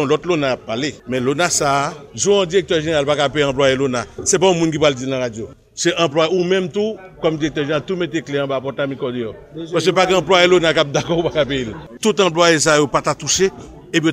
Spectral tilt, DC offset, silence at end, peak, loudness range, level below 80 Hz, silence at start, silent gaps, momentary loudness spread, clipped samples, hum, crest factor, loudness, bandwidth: -3.5 dB/octave; under 0.1%; 0 s; 0 dBFS; 4 LU; -46 dBFS; 0 s; none; 10 LU; under 0.1%; none; 16 dB; -17 LUFS; 16 kHz